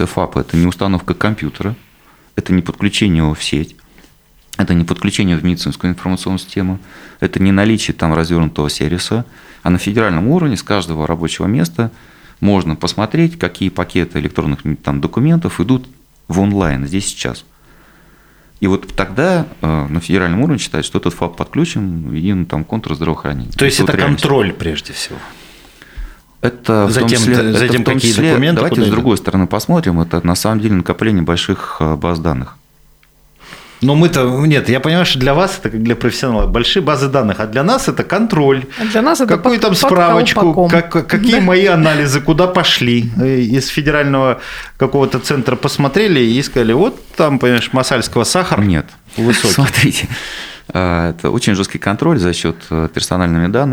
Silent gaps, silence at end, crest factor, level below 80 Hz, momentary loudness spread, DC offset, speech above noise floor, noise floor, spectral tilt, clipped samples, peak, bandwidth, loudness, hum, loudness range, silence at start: none; 0 s; 14 dB; -34 dBFS; 9 LU; under 0.1%; 35 dB; -48 dBFS; -5.5 dB/octave; under 0.1%; 0 dBFS; over 20 kHz; -14 LUFS; none; 6 LU; 0 s